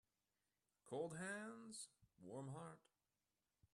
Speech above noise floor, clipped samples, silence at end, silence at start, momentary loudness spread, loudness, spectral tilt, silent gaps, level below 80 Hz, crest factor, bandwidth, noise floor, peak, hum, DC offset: over 38 dB; under 0.1%; 0.95 s; 0.85 s; 12 LU; -53 LUFS; -4.5 dB/octave; none; -90 dBFS; 20 dB; 12 kHz; under -90 dBFS; -36 dBFS; none; under 0.1%